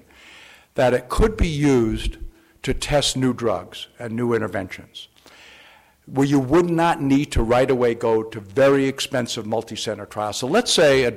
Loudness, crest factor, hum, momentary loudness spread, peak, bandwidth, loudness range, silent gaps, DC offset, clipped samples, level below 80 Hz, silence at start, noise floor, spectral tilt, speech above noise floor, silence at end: -20 LUFS; 12 dB; none; 13 LU; -10 dBFS; 15.5 kHz; 5 LU; none; under 0.1%; under 0.1%; -34 dBFS; 0.75 s; -51 dBFS; -5 dB/octave; 31 dB; 0 s